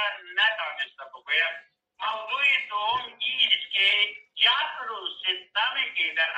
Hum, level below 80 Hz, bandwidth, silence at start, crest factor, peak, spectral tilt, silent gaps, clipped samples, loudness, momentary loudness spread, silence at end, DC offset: none; -76 dBFS; 8.8 kHz; 0 s; 20 dB; -8 dBFS; 0 dB/octave; none; under 0.1%; -24 LUFS; 12 LU; 0 s; under 0.1%